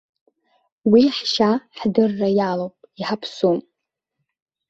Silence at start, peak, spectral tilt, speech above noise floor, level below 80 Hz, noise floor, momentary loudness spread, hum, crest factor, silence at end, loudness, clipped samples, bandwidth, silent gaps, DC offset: 0.85 s; -2 dBFS; -6 dB/octave; 61 dB; -62 dBFS; -80 dBFS; 12 LU; none; 18 dB; 1.1 s; -20 LUFS; under 0.1%; 7.8 kHz; none; under 0.1%